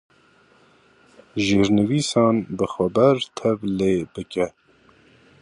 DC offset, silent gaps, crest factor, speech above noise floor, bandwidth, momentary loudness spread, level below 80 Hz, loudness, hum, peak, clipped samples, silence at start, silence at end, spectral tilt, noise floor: under 0.1%; none; 18 dB; 36 dB; 11 kHz; 9 LU; -52 dBFS; -21 LUFS; none; -4 dBFS; under 0.1%; 1.35 s; 0.95 s; -6 dB/octave; -56 dBFS